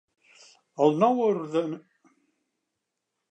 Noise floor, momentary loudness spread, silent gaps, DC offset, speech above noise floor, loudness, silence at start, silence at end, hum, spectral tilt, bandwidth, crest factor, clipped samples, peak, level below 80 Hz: -83 dBFS; 18 LU; none; under 0.1%; 59 dB; -25 LUFS; 0.8 s; 1.5 s; none; -7.5 dB/octave; 8.8 kHz; 20 dB; under 0.1%; -8 dBFS; -86 dBFS